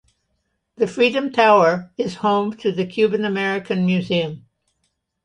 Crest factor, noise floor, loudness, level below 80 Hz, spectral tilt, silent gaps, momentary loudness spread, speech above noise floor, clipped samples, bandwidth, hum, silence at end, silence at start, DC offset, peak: 18 dB; -72 dBFS; -19 LUFS; -62 dBFS; -6.5 dB/octave; none; 10 LU; 53 dB; under 0.1%; 10.5 kHz; none; 0.85 s; 0.8 s; under 0.1%; -2 dBFS